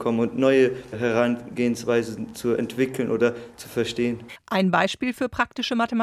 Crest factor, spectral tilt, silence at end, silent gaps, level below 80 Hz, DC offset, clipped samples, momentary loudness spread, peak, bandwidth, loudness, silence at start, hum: 18 dB; -5.5 dB/octave; 0 s; none; -56 dBFS; under 0.1%; under 0.1%; 7 LU; -6 dBFS; 14.5 kHz; -24 LUFS; 0 s; none